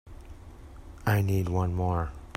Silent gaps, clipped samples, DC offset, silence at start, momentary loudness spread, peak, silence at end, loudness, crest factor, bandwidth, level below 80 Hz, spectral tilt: none; under 0.1%; under 0.1%; 0.05 s; 23 LU; -12 dBFS; 0.05 s; -28 LUFS; 18 dB; 16 kHz; -44 dBFS; -7.5 dB/octave